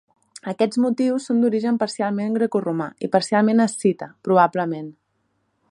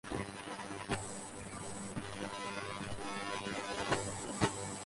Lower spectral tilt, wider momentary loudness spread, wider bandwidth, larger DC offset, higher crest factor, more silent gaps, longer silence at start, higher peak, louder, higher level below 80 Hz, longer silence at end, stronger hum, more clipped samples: first, -6 dB/octave vs -3.5 dB/octave; about the same, 10 LU vs 8 LU; about the same, 11.5 kHz vs 11.5 kHz; neither; about the same, 20 dB vs 24 dB; neither; first, 0.35 s vs 0.05 s; first, -2 dBFS vs -16 dBFS; first, -21 LUFS vs -40 LUFS; second, -72 dBFS vs -58 dBFS; first, 0.8 s vs 0 s; neither; neither